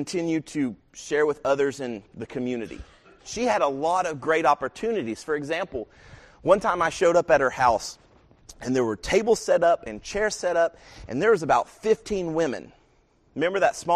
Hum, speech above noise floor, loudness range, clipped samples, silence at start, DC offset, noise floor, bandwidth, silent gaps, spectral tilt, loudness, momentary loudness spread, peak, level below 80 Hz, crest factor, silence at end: none; 38 dB; 4 LU; under 0.1%; 0 s; under 0.1%; -62 dBFS; 13 kHz; none; -4.5 dB/octave; -24 LUFS; 14 LU; -4 dBFS; -52 dBFS; 20 dB; 0 s